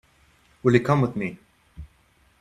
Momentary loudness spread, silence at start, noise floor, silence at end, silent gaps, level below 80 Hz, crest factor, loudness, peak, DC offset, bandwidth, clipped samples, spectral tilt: 12 LU; 0.65 s; -61 dBFS; 0.55 s; none; -52 dBFS; 24 dB; -23 LUFS; -2 dBFS; under 0.1%; 12 kHz; under 0.1%; -8 dB/octave